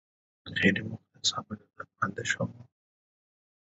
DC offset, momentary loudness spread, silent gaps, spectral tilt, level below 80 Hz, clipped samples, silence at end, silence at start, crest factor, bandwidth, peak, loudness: under 0.1%; 18 LU; none; -3 dB/octave; -64 dBFS; under 0.1%; 1.05 s; 0.45 s; 24 dB; 7.6 kHz; -10 dBFS; -30 LUFS